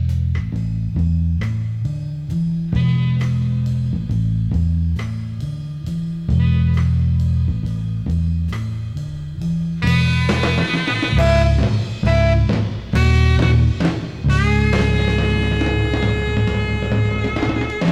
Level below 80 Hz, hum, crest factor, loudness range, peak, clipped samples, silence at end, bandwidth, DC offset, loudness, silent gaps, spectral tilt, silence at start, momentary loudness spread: -24 dBFS; none; 14 dB; 4 LU; -4 dBFS; under 0.1%; 0 s; 9.8 kHz; under 0.1%; -19 LUFS; none; -7 dB/octave; 0 s; 9 LU